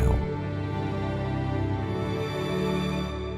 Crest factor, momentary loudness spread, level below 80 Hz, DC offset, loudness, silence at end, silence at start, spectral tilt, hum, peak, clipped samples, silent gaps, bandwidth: 18 dB; 3 LU; -36 dBFS; under 0.1%; -29 LUFS; 0 s; 0 s; -7.5 dB/octave; none; -10 dBFS; under 0.1%; none; 14 kHz